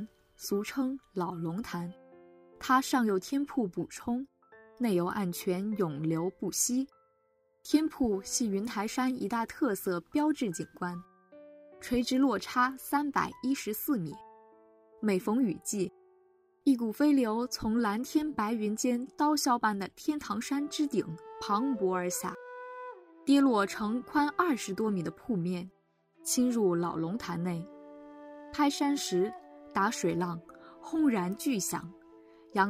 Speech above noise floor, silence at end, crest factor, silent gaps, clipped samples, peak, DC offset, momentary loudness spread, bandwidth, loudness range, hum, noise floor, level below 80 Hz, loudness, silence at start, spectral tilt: 41 dB; 0 s; 20 dB; none; under 0.1%; -12 dBFS; under 0.1%; 13 LU; 16 kHz; 3 LU; none; -72 dBFS; -64 dBFS; -31 LUFS; 0 s; -4.5 dB/octave